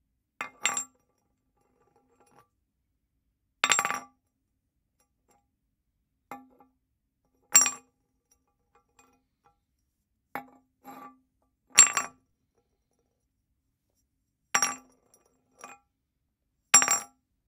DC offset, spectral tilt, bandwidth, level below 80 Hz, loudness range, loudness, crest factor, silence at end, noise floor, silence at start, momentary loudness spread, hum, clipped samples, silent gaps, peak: under 0.1%; 2 dB/octave; 16 kHz; -76 dBFS; 11 LU; -23 LUFS; 32 dB; 0.4 s; -80 dBFS; 0.4 s; 24 LU; none; under 0.1%; none; -2 dBFS